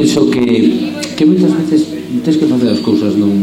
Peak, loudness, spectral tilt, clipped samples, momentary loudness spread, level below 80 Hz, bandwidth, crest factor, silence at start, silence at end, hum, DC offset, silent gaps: 0 dBFS; -12 LUFS; -6.5 dB/octave; under 0.1%; 7 LU; -50 dBFS; 13.5 kHz; 10 dB; 0 s; 0 s; none; under 0.1%; none